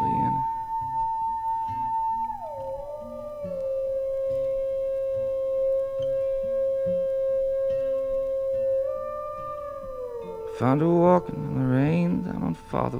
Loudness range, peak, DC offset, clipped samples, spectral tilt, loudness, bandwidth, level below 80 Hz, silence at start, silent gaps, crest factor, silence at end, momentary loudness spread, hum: 5 LU; -6 dBFS; under 0.1%; under 0.1%; -9.5 dB/octave; -27 LUFS; 7 kHz; -50 dBFS; 0 s; none; 20 dB; 0 s; 12 LU; none